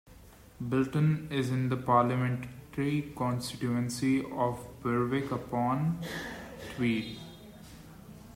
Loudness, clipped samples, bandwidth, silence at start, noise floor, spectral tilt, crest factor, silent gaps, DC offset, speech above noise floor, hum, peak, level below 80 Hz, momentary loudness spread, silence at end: -31 LUFS; under 0.1%; 16 kHz; 0.05 s; -54 dBFS; -6.5 dB/octave; 20 dB; none; under 0.1%; 23 dB; none; -12 dBFS; -58 dBFS; 19 LU; 0 s